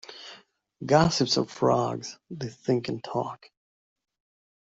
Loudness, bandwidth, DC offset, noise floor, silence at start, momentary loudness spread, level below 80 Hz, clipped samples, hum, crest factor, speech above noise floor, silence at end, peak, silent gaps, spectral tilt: -26 LUFS; 8 kHz; under 0.1%; -53 dBFS; 0.1 s; 20 LU; -60 dBFS; under 0.1%; none; 22 dB; 27 dB; 1.35 s; -6 dBFS; none; -5 dB/octave